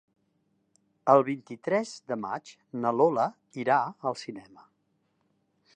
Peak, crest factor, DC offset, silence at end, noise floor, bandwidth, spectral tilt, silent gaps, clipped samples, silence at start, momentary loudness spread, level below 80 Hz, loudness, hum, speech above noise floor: -6 dBFS; 24 dB; under 0.1%; 1.35 s; -74 dBFS; 9.6 kHz; -6 dB/octave; none; under 0.1%; 1.05 s; 16 LU; -82 dBFS; -28 LUFS; none; 46 dB